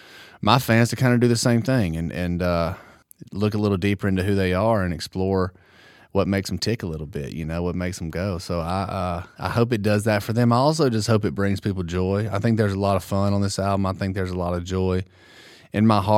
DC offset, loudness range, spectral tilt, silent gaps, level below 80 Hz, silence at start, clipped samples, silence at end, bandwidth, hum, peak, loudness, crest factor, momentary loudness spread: under 0.1%; 5 LU; -6 dB/octave; none; -46 dBFS; 0.1 s; under 0.1%; 0 s; 16.5 kHz; none; 0 dBFS; -23 LUFS; 22 dB; 9 LU